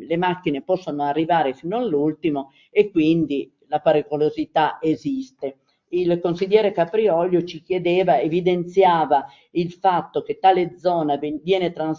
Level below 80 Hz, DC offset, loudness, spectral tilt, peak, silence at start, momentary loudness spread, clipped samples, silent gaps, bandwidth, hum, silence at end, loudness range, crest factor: -62 dBFS; under 0.1%; -21 LUFS; -7.5 dB/octave; -2 dBFS; 0 s; 8 LU; under 0.1%; none; 7.2 kHz; none; 0 s; 3 LU; 18 dB